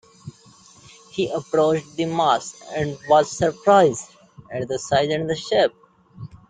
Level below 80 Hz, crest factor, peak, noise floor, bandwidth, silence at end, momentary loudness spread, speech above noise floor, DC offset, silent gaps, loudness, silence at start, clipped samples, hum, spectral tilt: -58 dBFS; 20 dB; -2 dBFS; -50 dBFS; 9.4 kHz; 0.15 s; 17 LU; 30 dB; under 0.1%; none; -21 LUFS; 0.25 s; under 0.1%; none; -4.5 dB/octave